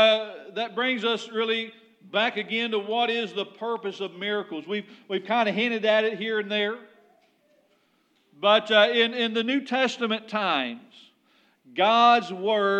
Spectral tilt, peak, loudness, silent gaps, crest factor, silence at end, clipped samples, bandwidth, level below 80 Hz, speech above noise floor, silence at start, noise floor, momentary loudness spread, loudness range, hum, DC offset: -4 dB/octave; -6 dBFS; -24 LUFS; none; 20 dB; 0 s; under 0.1%; 9 kHz; under -90 dBFS; 42 dB; 0 s; -67 dBFS; 13 LU; 4 LU; none; under 0.1%